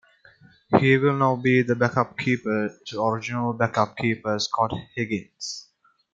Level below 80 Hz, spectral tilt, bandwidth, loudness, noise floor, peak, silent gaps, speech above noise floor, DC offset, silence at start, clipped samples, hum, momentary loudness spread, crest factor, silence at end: -62 dBFS; -6 dB/octave; 7.8 kHz; -24 LUFS; -54 dBFS; -2 dBFS; none; 31 dB; under 0.1%; 0.7 s; under 0.1%; none; 11 LU; 22 dB; 0.5 s